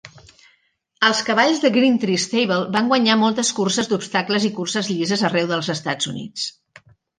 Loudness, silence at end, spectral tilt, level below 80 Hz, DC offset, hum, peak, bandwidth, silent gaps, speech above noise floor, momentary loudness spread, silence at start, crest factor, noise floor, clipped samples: -19 LUFS; 0.7 s; -3.5 dB/octave; -64 dBFS; under 0.1%; none; -2 dBFS; 10 kHz; none; 45 dB; 8 LU; 0.05 s; 18 dB; -64 dBFS; under 0.1%